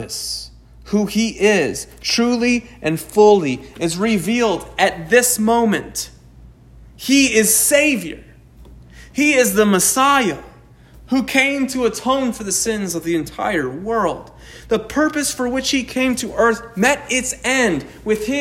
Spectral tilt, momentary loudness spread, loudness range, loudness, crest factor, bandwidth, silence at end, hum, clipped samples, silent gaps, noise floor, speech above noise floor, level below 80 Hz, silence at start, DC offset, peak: -3 dB/octave; 11 LU; 5 LU; -17 LUFS; 18 dB; 16.5 kHz; 0 s; none; under 0.1%; none; -44 dBFS; 27 dB; -44 dBFS; 0 s; under 0.1%; 0 dBFS